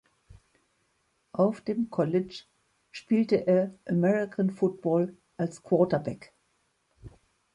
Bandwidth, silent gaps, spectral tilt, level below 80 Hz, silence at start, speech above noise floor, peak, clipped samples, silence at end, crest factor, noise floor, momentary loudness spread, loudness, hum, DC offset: 10.5 kHz; none; -8 dB/octave; -64 dBFS; 1.35 s; 46 dB; -10 dBFS; under 0.1%; 0.45 s; 20 dB; -73 dBFS; 14 LU; -28 LUFS; none; under 0.1%